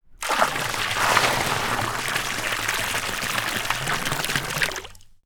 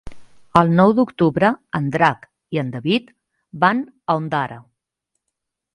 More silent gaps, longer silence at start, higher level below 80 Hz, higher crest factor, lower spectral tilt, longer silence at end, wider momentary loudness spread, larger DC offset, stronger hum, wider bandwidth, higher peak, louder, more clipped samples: neither; about the same, 0.1 s vs 0.05 s; first, -44 dBFS vs -52 dBFS; about the same, 22 dB vs 20 dB; second, -2 dB/octave vs -7.5 dB/octave; second, 0.2 s vs 1.15 s; second, 5 LU vs 10 LU; neither; neither; first, over 20 kHz vs 10.5 kHz; about the same, -2 dBFS vs 0 dBFS; second, -23 LUFS vs -19 LUFS; neither